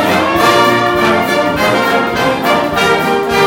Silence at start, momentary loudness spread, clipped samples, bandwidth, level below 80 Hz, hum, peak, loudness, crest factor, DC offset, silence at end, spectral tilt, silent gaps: 0 s; 3 LU; under 0.1%; 17.5 kHz; -40 dBFS; none; 0 dBFS; -11 LUFS; 12 dB; under 0.1%; 0 s; -4 dB/octave; none